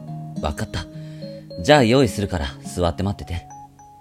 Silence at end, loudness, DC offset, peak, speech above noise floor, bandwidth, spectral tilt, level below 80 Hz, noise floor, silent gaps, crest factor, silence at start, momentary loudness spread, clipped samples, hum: 0.15 s; -21 LUFS; under 0.1%; 0 dBFS; 22 dB; 16 kHz; -5.5 dB/octave; -38 dBFS; -42 dBFS; none; 22 dB; 0 s; 20 LU; under 0.1%; none